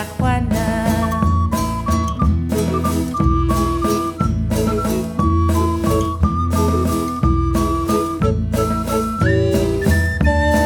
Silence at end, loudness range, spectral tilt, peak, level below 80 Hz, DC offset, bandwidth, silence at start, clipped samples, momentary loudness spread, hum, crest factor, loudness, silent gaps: 0 s; 1 LU; -6.5 dB/octave; -2 dBFS; -24 dBFS; under 0.1%; 19.5 kHz; 0 s; under 0.1%; 3 LU; none; 14 dB; -18 LUFS; none